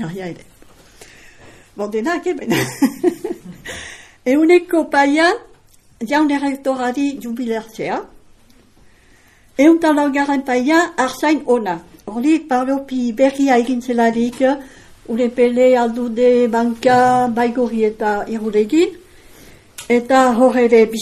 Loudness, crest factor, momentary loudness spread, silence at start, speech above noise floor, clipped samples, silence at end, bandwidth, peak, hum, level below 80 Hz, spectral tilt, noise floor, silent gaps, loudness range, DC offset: -16 LUFS; 16 dB; 14 LU; 0 s; 34 dB; under 0.1%; 0 s; 14.5 kHz; 0 dBFS; none; -52 dBFS; -5 dB/octave; -49 dBFS; none; 6 LU; under 0.1%